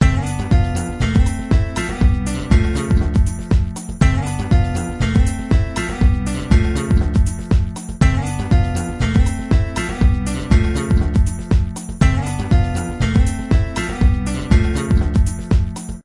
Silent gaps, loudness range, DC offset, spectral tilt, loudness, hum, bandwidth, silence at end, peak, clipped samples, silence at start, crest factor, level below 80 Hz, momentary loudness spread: none; 0 LU; under 0.1%; -6.5 dB/octave; -18 LUFS; none; 11.5 kHz; 0.05 s; 0 dBFS; under 0.1%; 0 s; 16 dB; -20 dBFS; 5 LU